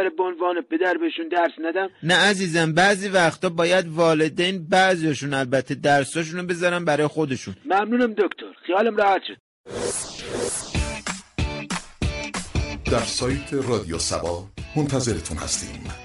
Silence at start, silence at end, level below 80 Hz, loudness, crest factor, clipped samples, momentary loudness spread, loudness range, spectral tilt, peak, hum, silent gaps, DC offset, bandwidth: 0 s; 0 s; -40 dBFS; -22 LUFS; 14 dB; under 0.1%; 10 LU; 7 LU; -4 dB/octave; -8 dBFS; none; 9.40-9.64 s; under 0.1%; 11.5 kHz